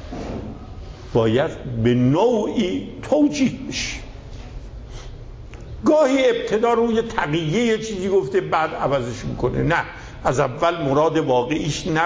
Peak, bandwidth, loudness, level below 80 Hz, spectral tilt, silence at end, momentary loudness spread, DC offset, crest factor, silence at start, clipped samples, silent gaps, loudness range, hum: -6 dBFS; 8 kHz; -20 LUFS; -40 dBFS; -6 dB/octave; 0 s; 20 LU; under 0.1%; 16 dB; 0 s; under 0.1%; none; 3 LU; none